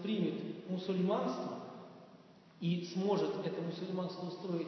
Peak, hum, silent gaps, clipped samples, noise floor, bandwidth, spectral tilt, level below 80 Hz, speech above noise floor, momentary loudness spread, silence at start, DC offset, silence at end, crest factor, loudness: -20 dBFS; none; none; under 0.1%; -60 dBFS; 6.4 kHz; -6.5 dB/octave; -84 dBFS; 23 dB; 13 LU; 0 s; under 0.1%; 0 s; 16 dB; -38 LUFS